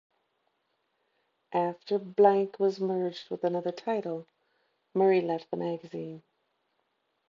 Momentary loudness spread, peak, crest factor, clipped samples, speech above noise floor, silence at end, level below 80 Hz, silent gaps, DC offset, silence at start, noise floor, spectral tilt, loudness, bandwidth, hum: 16 LU; -10 dBFS; 22 dB; under 0.1%; 49 dB; 1.1 s; -84 dBFS; none; under 0.1%; 1.5 s; -77 dBFS; -7.5 dB/octave; -29 LUFS; 7 kHz; none